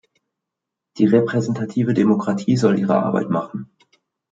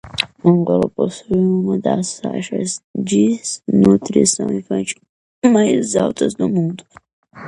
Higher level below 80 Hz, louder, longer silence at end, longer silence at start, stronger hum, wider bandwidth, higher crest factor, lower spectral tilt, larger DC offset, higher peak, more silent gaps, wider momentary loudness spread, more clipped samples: second, -64 dBFS vs -52 dBFS; about the same, -19 LUFS vs -17 LUFS; first, 0.7 s vs 0 s; first, 0.95 s vs 0.05 s; neither; second, 7.8 kHz vs 11.5 kHz; about the same, 18 dB vs 18 dB; first, -7.5 dB/octave vs -5.5 dB/octave; neither; about the same, -2 dBFS vs 0 dBFS; second, none vs 2.84-2.94 s, 5.09-5.42 s, 7.13-7.23 s; second, 7 LU vs 10 LU; neither